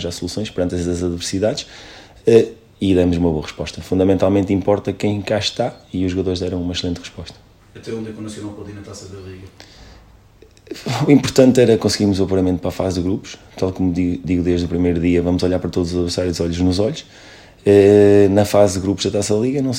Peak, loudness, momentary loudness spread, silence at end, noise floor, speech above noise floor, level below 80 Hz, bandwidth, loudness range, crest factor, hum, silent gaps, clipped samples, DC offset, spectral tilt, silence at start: 0 dBFS; -17 LUFS; 18 LU; 0 s; -47 dBFS; 30 dB; -46 dBFS; 16 kHz; 13 LU; 18 dB; none; none; under 0.1%; under 0.1%; -6 dB/octave; 0 s